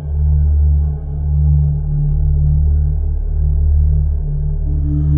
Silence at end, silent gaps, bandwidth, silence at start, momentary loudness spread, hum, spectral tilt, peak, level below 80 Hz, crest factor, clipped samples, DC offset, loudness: 0 s; none; 1.1 kHz; 0 s; 6 LU; none; -14.5 dB/octave; -4 dBFS; -16 dBFS; 10 dB; under 0.1%; under 0.1%; -16 LUFS